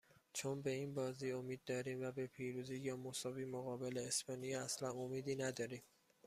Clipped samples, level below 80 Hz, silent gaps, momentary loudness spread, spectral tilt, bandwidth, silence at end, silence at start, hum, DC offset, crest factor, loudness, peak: under 0.1%; -80 dBFS; none; 5 LU; -4 dB/octave; 15.5 kHz; 0.4 s; 0.35 s; none; under 0.1%; 20 dB; -45 LUFS; -26 dBFS